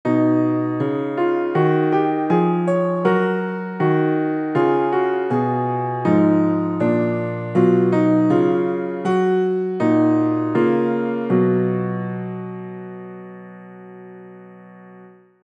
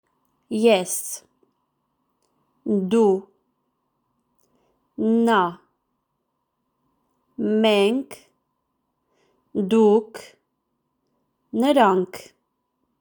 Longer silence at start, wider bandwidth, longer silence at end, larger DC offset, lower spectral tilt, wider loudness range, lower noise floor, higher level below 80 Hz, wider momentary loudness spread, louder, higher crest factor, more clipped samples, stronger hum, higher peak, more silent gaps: second, 0.05 s vs 0.5 s; second, 8 kHz vs over 20 kHz; second, 0.35 s vs 0.8 s; neither; first, -9.5 dB/octave vs -5 dB/octave; about the same, 6 LU vs 4 LU; second, -46 dBFS vs -76 dBFS; about the same, -72 dBFS vs -72 dBFS; about the same, 17 LU vs 19 LU; about the same, -19 LUFS vs -21 LUFS; about the same, 16 dB vs 20 dB; neither; neither; about the same, -4 dBFS vs -4 dBFS; neither